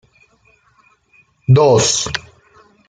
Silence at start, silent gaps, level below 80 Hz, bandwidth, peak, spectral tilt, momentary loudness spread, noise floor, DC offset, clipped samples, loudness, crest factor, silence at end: 1.5 s; none; -48 dBFS; 9.6 kHz; -2 dBFS; -4.5 dB/octave; 16 LU; -55 dBFS; under 0.1%; under 0.1%; -13 LUFS; 16 dB; 0.7 s